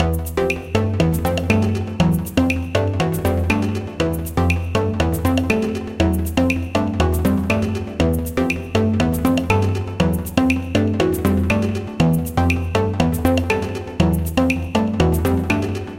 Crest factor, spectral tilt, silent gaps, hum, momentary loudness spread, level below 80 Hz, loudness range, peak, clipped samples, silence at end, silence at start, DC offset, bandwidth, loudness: 18 dB; -6.5 dB/octave; none; none; 3 LU; -30 dBFS; 1 LU; -2 dBFS; under 0.1%; 0 s; 0 s; under 0.1%; 16.5 kHz; -19 LUFS